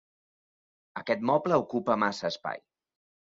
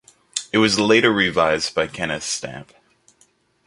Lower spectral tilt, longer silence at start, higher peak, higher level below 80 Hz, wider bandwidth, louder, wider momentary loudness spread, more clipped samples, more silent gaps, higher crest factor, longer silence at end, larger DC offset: first, -5.5 dB/octave vs -3.5 dB/octave; first, 0.95 s vs 0.35 s; second, -10 dBFS vs 0 dBFS; second, -72 dBFS vs -52 dBFS; second, 7.8 kHz vs 11.5 kHz; second, -28 LUFS vs -19 LUFS; about the same, 15 LU vs 14 LU; neither; neither; about the same, 20 dB vs 20 dB; second, 0.75 s vs 1.05 s; neither